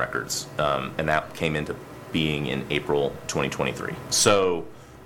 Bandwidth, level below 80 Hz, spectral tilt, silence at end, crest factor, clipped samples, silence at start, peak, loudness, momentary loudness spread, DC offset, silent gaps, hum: 18 kHz; -48 dBFS; -3.5 dB/octave; 0 s; 20 dB; under 0.1%; 0 s; -6 dBFS; -25 LUFS; 11 LU; under 0.1%; none; none